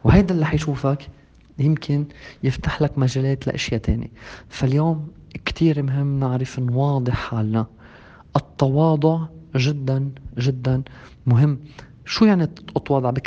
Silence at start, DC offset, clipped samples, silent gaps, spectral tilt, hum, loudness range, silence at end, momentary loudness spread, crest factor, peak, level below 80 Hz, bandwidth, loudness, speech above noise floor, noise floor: 0.05 s; under 0.1%; under 0.1%; none; -7.5 dB/octave; none; 2 LU; 0 s; 11 LU; 20 dB; 0 dBFS; -38 dBFS; 7.6 kHz; -21 LUFS; 25 dB; -45 dBFS